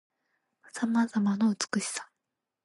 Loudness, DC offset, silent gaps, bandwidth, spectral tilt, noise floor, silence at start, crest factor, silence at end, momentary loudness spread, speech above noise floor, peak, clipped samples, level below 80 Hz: -29 LUFS; under 0.1%; none; 11.5 kHz; -4.5 dB/octave; -86 dBFS; 0.75 s; 22 dB; 0.6 s; 10 LU; 58 dB; -10 dBFS; under 0.1%; -80 dBFS